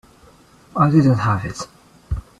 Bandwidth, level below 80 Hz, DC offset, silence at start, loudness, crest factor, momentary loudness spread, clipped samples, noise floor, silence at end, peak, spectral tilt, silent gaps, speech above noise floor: 11.5 kHz; -38 dBFS; under 0.1%; 0.75 s; -19 LUFS; 18 dB; 17 LU; under 0.1%; -49 dBFS; 0.2 s; -2 dBFS; -7.5 dB/octave; none; 33 dB